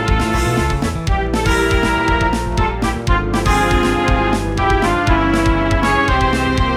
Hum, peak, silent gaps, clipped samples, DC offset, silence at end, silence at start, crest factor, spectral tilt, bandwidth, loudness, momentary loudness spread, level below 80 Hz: none; -2 dBFS; none; under 0.1%; under 0.1%; 0 s; 0 s; 14 dB; -5.5 dB/octave; 15 kHz; -16 LUFS; 4 LU; -20 dBFS